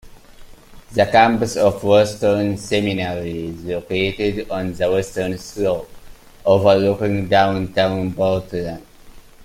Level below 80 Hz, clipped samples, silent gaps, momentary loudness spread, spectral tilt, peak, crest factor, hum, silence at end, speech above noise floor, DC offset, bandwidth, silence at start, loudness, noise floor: -44 dBFS; under 0.1%; none; 12 LU; -6 dB/octave; 0 dBFS; 18 dB; none; 0 s; 24 dB; under 0.1%; 16 kHz; 0.05 s; -19 LUFS; -42 dBFS